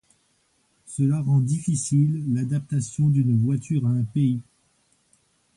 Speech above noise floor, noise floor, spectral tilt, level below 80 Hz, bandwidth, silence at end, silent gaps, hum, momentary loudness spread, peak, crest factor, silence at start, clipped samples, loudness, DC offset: 45 dB; -67 dBFS; -7.5 dB/octave; -60 dBFS; 11.5 kHz; 1.15 s; none; none; 5 LU; -10 dBFS; 12 dB; 0.9 s; under 0.1%; -23 LUFS; under 0.1%